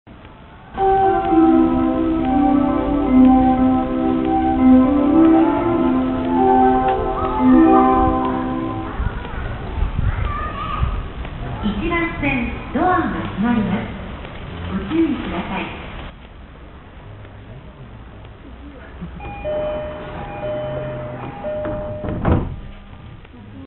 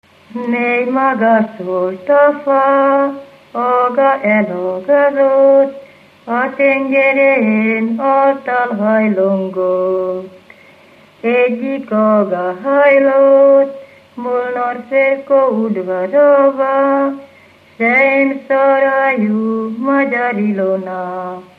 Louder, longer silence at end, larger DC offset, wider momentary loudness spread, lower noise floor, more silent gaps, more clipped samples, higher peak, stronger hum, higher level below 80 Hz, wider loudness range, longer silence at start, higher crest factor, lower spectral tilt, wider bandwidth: second, -18 LUFS vs -13 LUFS; second, 0 s vs 0.15 s; neither; first, 22 LU vs 10 LU; second, -40 dBFS vs -44 dBFS; neither; neither; about the same, -2 dBFS vs 0 dBFS; neither; first, -30 dBFS vs -70 dBFS; first, 15 LU vs 3 LU; second, 0.05 s vs 0.3 s; first, 18 dB vs 12 dB; first, -12.5 dB/octave vs -8.5 dB/octave; second, 4.1 kHz vs 4.7 kHz